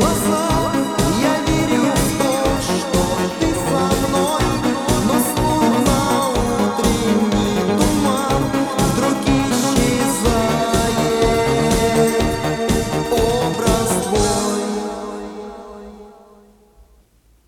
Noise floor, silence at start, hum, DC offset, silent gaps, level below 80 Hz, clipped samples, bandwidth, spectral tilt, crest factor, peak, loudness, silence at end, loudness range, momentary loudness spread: -54 dBFS; 0 s; none; under 0.1%; none; -32 dBFS; under 0.1%; 18.5 kHz; -4.5 dB/octave; 16 dB; -2 dBFS; -17 LUFS; 1.35 s; 3 LU; 4 LU